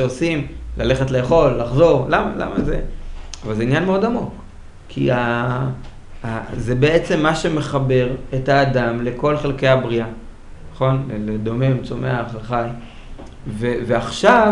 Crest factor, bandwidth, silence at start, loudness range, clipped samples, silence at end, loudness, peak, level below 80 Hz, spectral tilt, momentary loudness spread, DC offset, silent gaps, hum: 18 dB; 10.5 kHz; 0 s; 4 LU; under 0.1%; 0 s; -19 LUFS; 0 dBFS; -34 dBFS; -6.5 dB/octave; 16 LU; under 0.1%; none; none